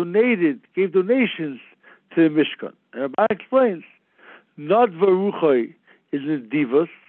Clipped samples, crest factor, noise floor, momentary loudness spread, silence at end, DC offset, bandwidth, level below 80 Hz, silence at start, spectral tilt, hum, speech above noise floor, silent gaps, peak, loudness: under 0.1%; 16 dB; -50 dBFS; 14 LU; 0.2 s; under 0.1%; 4.2 kHz; -76 dBFS; 0 s; -10 dB/octave; none; 30 dB; none; -6 dBFS; -20 LUFS